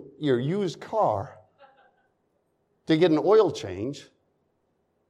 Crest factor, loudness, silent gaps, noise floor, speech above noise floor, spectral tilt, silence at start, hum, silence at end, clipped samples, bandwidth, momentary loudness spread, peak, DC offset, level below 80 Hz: 18 dB; -24 LUFS; none; -72 dBFS; 49 dB; -7 dB/octave; 0 s; none; 1.05 s; under 0.1%; 10 kHz; 14 LU; -8 dBFS; under 0.1%; -72 dBFS